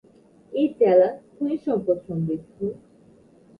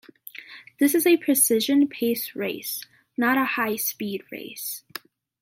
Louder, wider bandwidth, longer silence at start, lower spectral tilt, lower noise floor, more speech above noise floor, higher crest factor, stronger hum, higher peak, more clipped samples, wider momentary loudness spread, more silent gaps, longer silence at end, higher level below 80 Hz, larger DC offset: about the same, -23 LUFS vs -23 LUFS; second, 5 kHz vs 16.5 kHz; first, 0.5 s vs 0.35 s; first, -10 dB/octave vs -2.5 dB/octave; first, -54 dBFS vs -44 dBFS; first, 32 dB vs 21 dB; about the same, 18 dB vs 18 dB; neither; about the same, -6 dBFS vs -8 dBFS; neither; second, 14 LU vs 21 LU; neither; first, 0.85 s vs 0.65 s; first, -62 dBFS vs -78 dBFS; neither